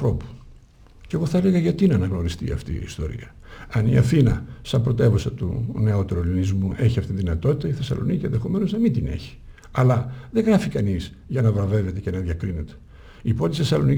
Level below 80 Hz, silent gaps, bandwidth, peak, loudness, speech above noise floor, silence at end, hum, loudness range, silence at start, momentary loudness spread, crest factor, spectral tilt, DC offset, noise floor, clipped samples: -38 dBFS; none; 12 kHz; -6 dBFS; -23 LUFS; 27 dB; 0 s; none; 2 LU; 0 s; 12 LU; 16 dB; -8 dB/octave; under 0.1%; -48 dBFS; under 0.1%